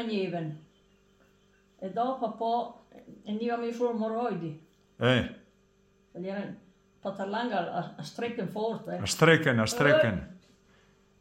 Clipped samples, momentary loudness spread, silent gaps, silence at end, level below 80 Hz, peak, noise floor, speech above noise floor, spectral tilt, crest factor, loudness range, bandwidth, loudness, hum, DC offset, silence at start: under 0.1%; 18 LU; none; 0.85 s; -62 dBFS; -8 dBFS; -65 dBFS; 36 dB; -5 dB/octave; 22 dB; 8 LU; 16 kHz; -29 LUFS; none; under 0.1%; 0 s